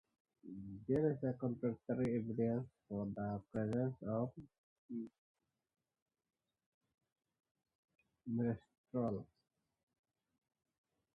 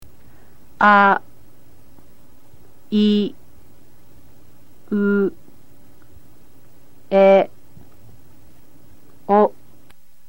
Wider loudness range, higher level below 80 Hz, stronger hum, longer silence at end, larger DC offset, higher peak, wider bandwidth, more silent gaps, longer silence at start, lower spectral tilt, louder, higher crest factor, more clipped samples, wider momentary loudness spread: first, 17 LU vs 8 LU; second, -72 dBFS vs -58 dBFS; neither; first, 1.9 s vs 0.8 s; second, under 0.1% vs 2%; second, -24 dBFS vs -2 dBFS; second, 5 kHz vs 16.5 kHz; first, 4.58-4.89 s, 5.18-5.35 s, 6.02-6.06 s, 6.66-6.81 s, 7.12-7.16 s, 7.51-7.55 s, 7.75-7.88 s, 8.78-8.84 s vs none; first, 0.45 s vs 0 s; first, -10 dB/octave vs -7.5 dB/octave; second, -41 LUFS vs -17 LUFS; about the same, 20 dB vs 18 dB; neither; about the same, 13 LU vs 13 LU